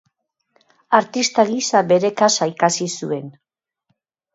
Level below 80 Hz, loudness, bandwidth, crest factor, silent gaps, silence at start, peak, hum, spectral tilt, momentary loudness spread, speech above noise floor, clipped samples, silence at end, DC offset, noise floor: -70 dBFS; -18 LUFS; 8 kHz; 20 dB; none; 0.9 s; 0 dBFS; none; -3.5 dB/octave; 9 LU; 53 dB; under 0.1%; 1.05 s; under 0.1%; -71 dBFS